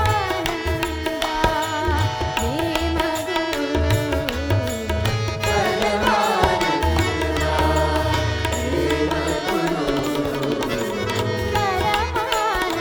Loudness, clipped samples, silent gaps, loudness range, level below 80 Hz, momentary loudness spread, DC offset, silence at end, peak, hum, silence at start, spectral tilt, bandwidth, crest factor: -21 LUFS; under 0.1%; none; 2 LU; -32 dBFS; 4 LU; under 0.1%; 0 s; -2 dBFS; none; 0 s; -5 dB/octave; over 20 kHz; 20 dB